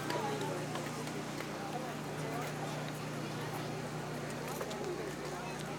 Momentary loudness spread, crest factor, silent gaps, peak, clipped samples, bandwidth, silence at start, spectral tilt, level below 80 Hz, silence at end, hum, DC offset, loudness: 3 LU; 18 dB; none; -22 dBFS; under 0.1%; over 20 kHz; 0 s; -5 dB/octave; -64 dBFS; 0 s; 60 Hz at -55 dBFS; under 0.1%; -40 LUFS